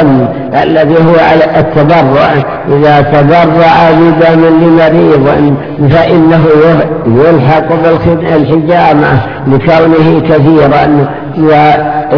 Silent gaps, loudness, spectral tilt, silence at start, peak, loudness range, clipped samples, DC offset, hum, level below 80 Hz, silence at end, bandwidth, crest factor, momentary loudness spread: none; -6 LUFS; -9 dB/octave; 0 s; 0 dBFS; 2 LU; 7%; under 0.1%; none; -32 dBFS; 0 s; 5.4 kHz; 4 dB; 5 LU